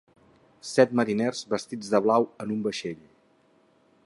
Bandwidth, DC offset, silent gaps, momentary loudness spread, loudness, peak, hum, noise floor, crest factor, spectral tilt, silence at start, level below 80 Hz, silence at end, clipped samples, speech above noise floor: 11.5 kHz; under 0.1%; none; 13 LU; -26 LUFS; -6 dBFS; none; -63 dBFS; 22 dB; -5 dB/octave; 0.65 s; -70 dBFS; 1.1 s; under 0.1%; 38 dB